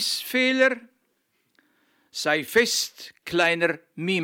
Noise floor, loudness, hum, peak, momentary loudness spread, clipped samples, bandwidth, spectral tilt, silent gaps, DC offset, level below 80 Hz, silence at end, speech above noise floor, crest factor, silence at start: -72 dBFS; -23 LUFS; none; -6 dBFS; 12 LU; under 0.1%; 17.5 kHz; -2.5 dB/octave; none; under 0.1%; -66 dBFS; 0 s; 48 dB; 20 dB; 0 s